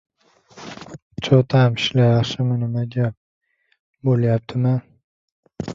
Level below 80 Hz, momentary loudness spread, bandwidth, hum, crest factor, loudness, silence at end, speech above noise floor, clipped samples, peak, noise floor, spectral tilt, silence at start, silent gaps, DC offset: -54 dBFS; 20 LU; 7.4 kHz; none; 18 dB; -19 LUFS; 0 s; 32 dB; under 0.1%; -2 dBFS; -49 dBFS; -7 dB/octave; 0.55 s; 1.02-1.10 s, 3.17-3.41 s, 3.80-3.93 s, 5.04-5.43 s; under 0.1%